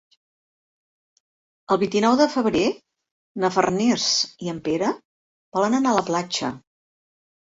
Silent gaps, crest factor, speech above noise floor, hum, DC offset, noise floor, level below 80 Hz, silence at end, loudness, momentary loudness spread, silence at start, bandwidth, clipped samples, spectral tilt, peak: 3.11-3.35 s, 5.05-5.52 s; 20 dB; over 69 dB; none; under 0.1%; under -90 dBFS; -60 dBFS; 0.95 s; -22 LUFS; 11 LU; 1.7 s; 8 kHz; under 0.1%; -4 dB/octave; -2 dBFS